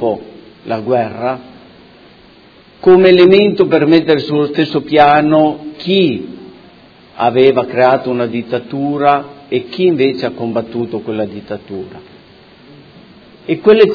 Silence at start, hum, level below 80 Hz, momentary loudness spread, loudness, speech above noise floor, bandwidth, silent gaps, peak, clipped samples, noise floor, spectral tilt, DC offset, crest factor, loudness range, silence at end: 0 s; none; -54 dBFS; 16 LU; -12 LUFS; 31 dB; 5.4 kHz; none; 0 dBFS; 0.3%; -43 dBFS; -8.5 dB/octave; under 0.1%; 14 dB; 9 LU; 0 s